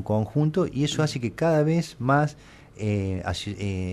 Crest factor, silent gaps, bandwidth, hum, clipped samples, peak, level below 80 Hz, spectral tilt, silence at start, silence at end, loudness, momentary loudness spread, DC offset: 14 dB; none; 12.5 kHz; none; under 0.1%; -10 dBFS; -50 dBFS; -6.5 dB/octave; 0 s; 0 s; -25 LUFS; 7 LU; under 0.1%